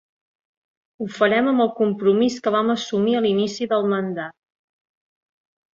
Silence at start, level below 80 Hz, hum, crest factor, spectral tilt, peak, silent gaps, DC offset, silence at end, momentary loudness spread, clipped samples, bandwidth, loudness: 1 s; -68 dBFS; none; 18 dB; -5.5 dB/octave; -4 dBFS; none; under 0.1%; 1.45 s; 11 LU; under 0.1%; 7.6 kHz; -20 LUFS